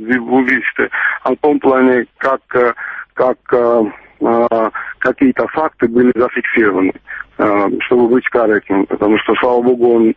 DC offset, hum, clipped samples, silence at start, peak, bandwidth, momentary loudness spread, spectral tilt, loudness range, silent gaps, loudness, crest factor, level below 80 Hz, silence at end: under 0.1%; none; under 0.1%; 0 s; 0 dBFS; 5 kHz; 6 LU; -8 dB/octave; 1 LU; none; -14 LUFS; 12 dB; -50 dBFS; 0.05 s